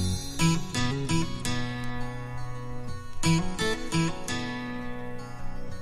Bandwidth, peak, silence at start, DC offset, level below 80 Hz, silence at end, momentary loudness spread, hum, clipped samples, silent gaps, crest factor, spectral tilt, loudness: 15.5 kHz; -12 dBFS; 0 s; under 0.1%; -42 dBFS; 0 s; 13 LU; none; under 0.1%; none; 18 dB; -4.5 dB/octave; -30 LUFS